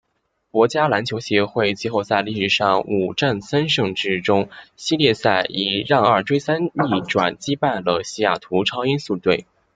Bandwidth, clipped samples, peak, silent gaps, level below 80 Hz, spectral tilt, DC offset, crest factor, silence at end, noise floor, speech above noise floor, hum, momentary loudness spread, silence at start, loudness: 9.2 kHz; under 0.1%; -2 dBFS; none; -58 dBFS; -5 dB/octave; under 0.1%; 18 dB; 0.35 s; -71 dBFS; 51 dB; none; 5 LU; 0.55 s; -20 LUFS